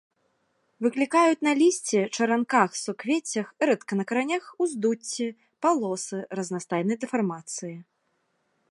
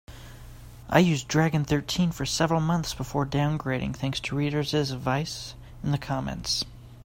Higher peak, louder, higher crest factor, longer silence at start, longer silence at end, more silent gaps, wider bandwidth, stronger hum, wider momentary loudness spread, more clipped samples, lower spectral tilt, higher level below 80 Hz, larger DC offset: about the same, -4 dBFS vs -4 dBFS; about the same, -26 LUFS vs -27 LUFS; about the same, 22 dB vs 22 dB; first, 0.8 s vs 0.1 s; first, 0.9 s vs 0 s; neither; second, 11.5 kHz vs 16.5 kHz; neither; second, 11 LU vs 15 LU; neither; about the same, -4.5 dB/octave vs -5 dB/octave; second, -80 dBFS vs -46 dBFS; neither